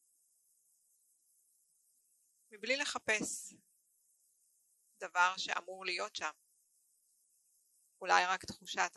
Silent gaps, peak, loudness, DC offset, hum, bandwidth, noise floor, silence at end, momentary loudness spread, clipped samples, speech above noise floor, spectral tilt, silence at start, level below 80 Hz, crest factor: none; -12 dBFS; -35 LUFS; under 0.1%; none; 12 kHz; -75 dBFS; 0.05 s; 14 LU; under 0.1%; 39 dB; -1 dB/octave; 2.5 s; -80 dBFS; 30 dB